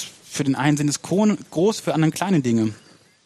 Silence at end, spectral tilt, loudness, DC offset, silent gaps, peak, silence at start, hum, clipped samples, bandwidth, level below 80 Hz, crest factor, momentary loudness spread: 0.5 s; -5.5 dB/octave; -21 LUFS; under 0.1%; none; -4 dBFS; 0 s; none; under 0.1%; 14 kHz; -62 dBFS; 16 dB; 5 LU